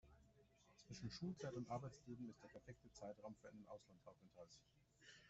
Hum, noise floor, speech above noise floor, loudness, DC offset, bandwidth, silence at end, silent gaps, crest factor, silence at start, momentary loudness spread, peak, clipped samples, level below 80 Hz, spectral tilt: none; -75 dBFS; 19 dB; -56 LUFS; under 0.1%; 8 kHz; 0 s; none; 18 dB; 0.05 s; 16 LU; -38 dBFS; under 0.1%; -78 dBFS; -6 dB/octave